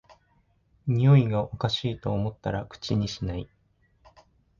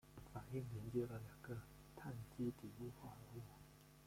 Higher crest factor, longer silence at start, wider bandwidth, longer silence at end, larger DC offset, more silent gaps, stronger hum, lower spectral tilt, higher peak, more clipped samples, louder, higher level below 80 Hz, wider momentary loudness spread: about the same, 18 dB vs 20 dB; first, 0.85 s vs 0.05 s; second, 7.2 kHz vs 16.5 kHz; first, 1.15 s vs 0 s; neither; neither; neither; about the same, -7.5 dB/octave vs -7.5 dB/octave; first, -8 dBFS vs -30 dBFS; neither; first, -26 LUFS vs -51 LUFS; first, -48 dBFS vs -68 dBFS; about the same, 14 LU vs 13 LU